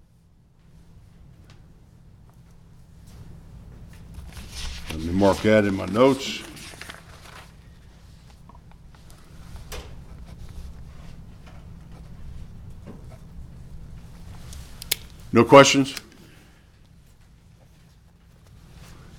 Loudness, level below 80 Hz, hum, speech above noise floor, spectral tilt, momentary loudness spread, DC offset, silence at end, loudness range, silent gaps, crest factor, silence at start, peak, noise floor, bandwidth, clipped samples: -19 LUFS; -44 dBFS; none; 39 dB; -4.5 dB/octave; 27 LU; under 0.1%; 3.2 s; 23 LU; none; 26 dB; 3.2 s; 0 dBFS; -56 dBFS; 19 kHz; under 0.1%